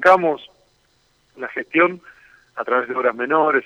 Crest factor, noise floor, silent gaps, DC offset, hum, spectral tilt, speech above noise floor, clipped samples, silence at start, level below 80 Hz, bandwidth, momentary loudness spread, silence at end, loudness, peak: 18 dB; -62 dBFS; none; under 0.1%; none; -6 dB/octave; 43 dB; under 0.1%; 0 s; -66 dBFS; 9.8 kHz; 16 LU; 0.05 s; -20 LUFS; -2 dBFS